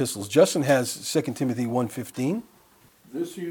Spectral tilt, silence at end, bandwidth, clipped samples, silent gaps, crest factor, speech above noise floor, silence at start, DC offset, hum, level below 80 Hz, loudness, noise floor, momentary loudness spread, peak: -5 dB/octave; 0 s; 19.5 kHz; under 0.1%; none; 20 dB; 33 dB; 0 s; under 0.1%; none; -68 dBFS; -25 LUFS; -57 dBFS; 13 LU; -6 dBFS